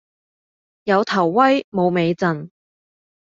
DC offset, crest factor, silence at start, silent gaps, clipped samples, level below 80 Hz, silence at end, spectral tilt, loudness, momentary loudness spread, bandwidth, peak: under 0.1%; 18 dB; 0.85 s; 1.64-1.72 s; under 0.1%; -64 dBFS; 0.9 s; -7 dB/octave; -18 LUFS; 9 LU; 7.6 kHz; -2 dBFS